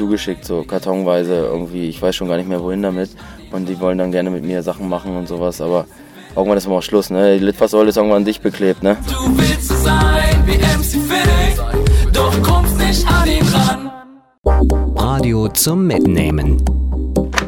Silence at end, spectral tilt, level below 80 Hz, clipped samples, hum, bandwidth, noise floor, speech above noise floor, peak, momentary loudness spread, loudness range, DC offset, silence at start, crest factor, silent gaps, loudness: 0 s; -5.5 dB/octave; -20 dBFS; under 0.1%; none; 17.5 kHz; -40 dBFS; 24 dB; 0 dBFS; 9 LU; 6 LU; under 0.1%; 0 s; 14 dB; 14.38-14.43 s; -16 LUFS